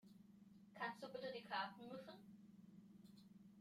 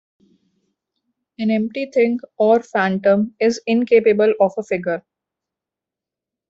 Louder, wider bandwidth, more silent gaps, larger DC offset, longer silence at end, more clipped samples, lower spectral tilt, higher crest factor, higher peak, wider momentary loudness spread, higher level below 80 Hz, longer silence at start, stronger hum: second, -51 LUFS vs -18 LUFS; first, 16 kHz vs 7.8 kHz; neither; neither; second, 0 s vs 1.5 s; neither; second, -5 dB/octave vs -6.5 dB/octave; about the same, 22 dB vs 18 dB; second, -32 dBFS vs -2 dBFS; first, 19 LU vs 8 LU; second, under -90 dBFS vs -64 dBFS; second, 0.05 s vs 1.4 s; neither